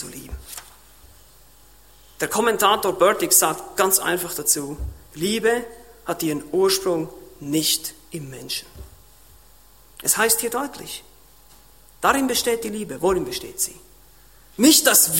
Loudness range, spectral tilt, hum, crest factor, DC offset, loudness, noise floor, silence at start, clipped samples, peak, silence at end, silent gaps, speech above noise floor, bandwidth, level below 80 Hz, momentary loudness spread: 6 LU; -2 dB/octave; none; 22 dB; 0.2%; -20 LUFS; -52 dBFS; 0 s; under 0.1%; -2 dBFS; 0 s; none; 31 dB; 16.5 kHz; -46 dBFS; 20 LU